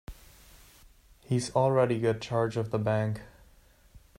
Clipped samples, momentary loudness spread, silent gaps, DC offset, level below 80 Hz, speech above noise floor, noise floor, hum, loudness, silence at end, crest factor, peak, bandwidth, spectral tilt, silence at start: under 0.1%; 9 LU; none; under 0.1%; -56 dBFS; 32 dB; -59 dBFS; none; -29 LUFS; 0.2 s; 20 dB; -12 dBFS; 16 kHz; -6.5 dB/octave; 0.1 s